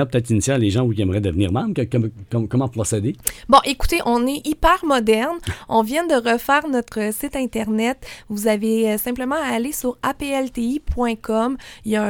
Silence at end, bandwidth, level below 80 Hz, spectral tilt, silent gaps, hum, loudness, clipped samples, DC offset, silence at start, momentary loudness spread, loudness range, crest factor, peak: 0 s; 19 kHz; -36 dBFS; -5 dB/octave; none; none; -20 LUFS; under 0.1%; under 0.1%; 0 s; 7 LU; 3 LU; 20 dB; 0 dBFS